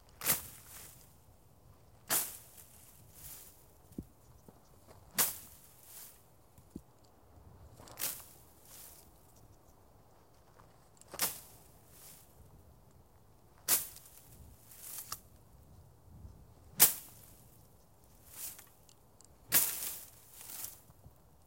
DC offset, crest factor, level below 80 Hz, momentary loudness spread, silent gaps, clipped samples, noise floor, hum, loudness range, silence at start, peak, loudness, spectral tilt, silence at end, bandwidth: under 0.1%; 36 dB; -66 dBFS; 27 LU; none; under 0.1%; -63 dBFS; none; 12 LU; 0.2 s; -6 dBFS; -33 LUFS; -0.5 dB/octave; 0.35 s; 16.5 kHz